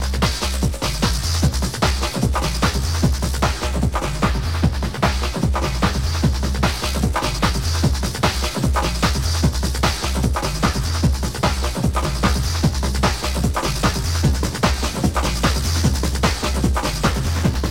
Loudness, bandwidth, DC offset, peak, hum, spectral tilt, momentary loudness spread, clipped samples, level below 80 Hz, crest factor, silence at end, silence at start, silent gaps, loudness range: -20 LUFS; 16.5 kHz; 0.8%; -2 dBFS; none; -4.5 dB/octave; 2 LU; under 0.1%; -24 dBFS; 16 dB; 0 s; 0 s; none; 1 LU